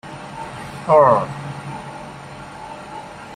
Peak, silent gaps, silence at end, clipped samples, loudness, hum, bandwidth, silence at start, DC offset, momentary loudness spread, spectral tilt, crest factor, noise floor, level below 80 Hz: -2 dBFS; none; 0 s; under 0.1%; -17 LUFS; 50 Hz at -50 dBFS; 11.5 kHz; 0.05 s; under 0.1%; 22 LU; -6.5 dB/octave; 20 dB; -35 dBFS; -54 dBFS